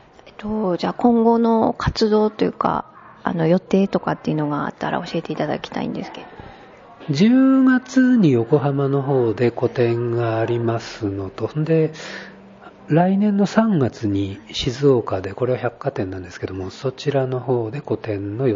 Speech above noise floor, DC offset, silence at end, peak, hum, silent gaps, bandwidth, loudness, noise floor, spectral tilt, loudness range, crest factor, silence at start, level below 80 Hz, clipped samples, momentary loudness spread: 24 dB; under 0.1%; 0 s; -2 dBFS; none; none; 7.6 kHz; -20 LUFS; -43 dBFS; -7.5 dB/octave; 6 LU; 18 dB; 0.25 s; -48 dBFS; under 0.1%; 12 LU